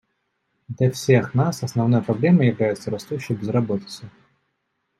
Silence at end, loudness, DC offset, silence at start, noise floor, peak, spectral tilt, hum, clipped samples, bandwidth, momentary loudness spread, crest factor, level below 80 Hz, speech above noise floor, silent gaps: 0.9 s; -21 LUFS; under 0.1%; 0.7 s; -74 dBFS; -2 dBFS; -7 dB/octave; none; under 0.1%; 13.5 kHz; 11 LU; 20 dB; -62 dBFS; 54 dB; none